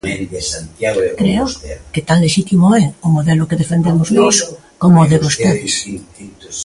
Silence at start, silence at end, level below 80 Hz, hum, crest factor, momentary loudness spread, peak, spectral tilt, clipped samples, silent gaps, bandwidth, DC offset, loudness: 0.05 s; 0 s; -40 dBFS; none; 14 dB; 12 LU; 0 dBFS; -5.5 dB/octave; under 0.1%; none; 11.5 kHz; under 0.1%; -14 LUFS